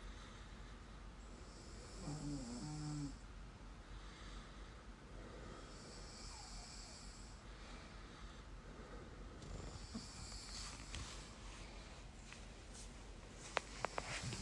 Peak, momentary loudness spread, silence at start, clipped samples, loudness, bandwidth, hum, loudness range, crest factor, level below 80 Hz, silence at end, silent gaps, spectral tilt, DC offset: -18 dBFS; 11 LU; 0 s; under 0.1%; -52 LUFS; 11.5 kHz; none; 4 LU; 34 dB; -56 dBFS; 0 s; none; -4 dB/octave; under 0.1%